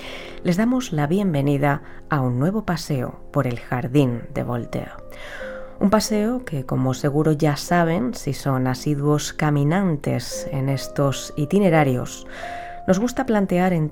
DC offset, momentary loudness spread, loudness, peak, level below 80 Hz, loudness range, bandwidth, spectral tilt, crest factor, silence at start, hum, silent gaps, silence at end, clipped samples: under 0.1%; 12 LU; -22 LUFS; -2 dBFS; -40 dBFS; 3 LU; 17 kHz; -6.5 dB/octave; 18 dB; 0 s; none; none; 0 s; under 0.1%